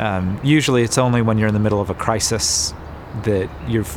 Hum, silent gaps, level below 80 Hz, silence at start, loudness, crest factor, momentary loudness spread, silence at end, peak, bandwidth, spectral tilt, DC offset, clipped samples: none; none; -38 dBFS; 0 s; -18 LUFS; 18 dB; 7 LU; 0 s; -2 dBFS; 17.5 kHz; -4.5 dB/octave; under 0.1%; under 0.1%